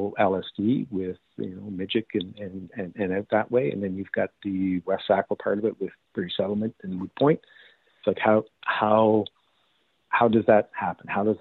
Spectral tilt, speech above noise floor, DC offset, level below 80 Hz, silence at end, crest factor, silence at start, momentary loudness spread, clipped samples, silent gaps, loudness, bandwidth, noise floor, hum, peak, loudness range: -9.5 dB/octave; 44 dB; under 0.1%; -66 dBFS; 0.05 s; 20 dB; 0 s; 14 LU; under 0.1%; none; -26 LUFS; 4.3 kHz; -69 dBFS; none; -6 dBFS; 5 LU